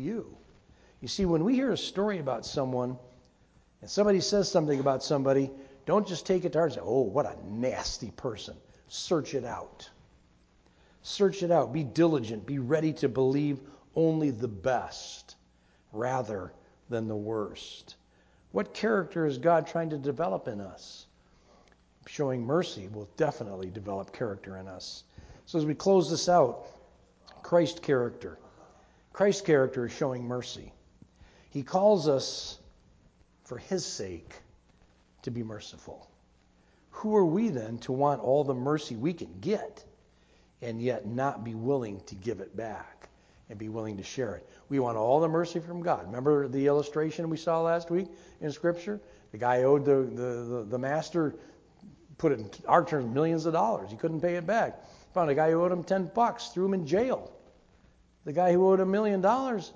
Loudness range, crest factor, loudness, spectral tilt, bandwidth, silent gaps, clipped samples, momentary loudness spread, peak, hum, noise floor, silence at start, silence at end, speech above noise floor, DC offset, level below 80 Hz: 7 LU; 22 dB; -29 LUFS; -6 dB/octave; 8 kHz; none; under 0.1%; 17 LU; -8 dBFS; none; -64 dBFS; 0 s; 0.05 s; 35 dB; under 0.1%; -60 dBFS